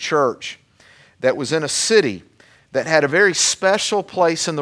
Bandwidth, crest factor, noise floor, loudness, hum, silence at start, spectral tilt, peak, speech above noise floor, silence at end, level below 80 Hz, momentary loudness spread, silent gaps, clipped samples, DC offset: 11 kHz; 18 dB; -51 dBFS; -17 LUFS; none; 0 s; -2.5 dB/octave; 0 dBFS; 33 dB; 0 s; -64 dBFS; 11 LU; none; under 0.1%; under 0.1%